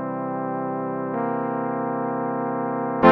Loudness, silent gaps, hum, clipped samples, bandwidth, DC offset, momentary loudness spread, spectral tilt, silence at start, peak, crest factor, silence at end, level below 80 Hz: -25 LUFS; none; none; under 0.1%; 5.6 kHz; under 0.1%; 2 LU; -6 dB/octave; 0 s; 0 dBFS; 24 dB; 0 s; -60 dBFS